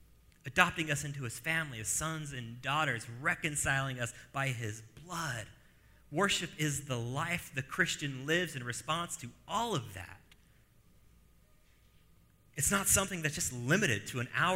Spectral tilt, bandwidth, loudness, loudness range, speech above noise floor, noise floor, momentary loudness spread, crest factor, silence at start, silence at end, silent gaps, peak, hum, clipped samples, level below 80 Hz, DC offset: -3 dB/octave; 16 kHz; -33 LUFS; 7 LU; 30 dB; -64 dBFS; 12 LU; 28 dB; 0 s; 0 s; none; -6 dBFS; none; under 0.1%; -58 dBFS; under 0.1%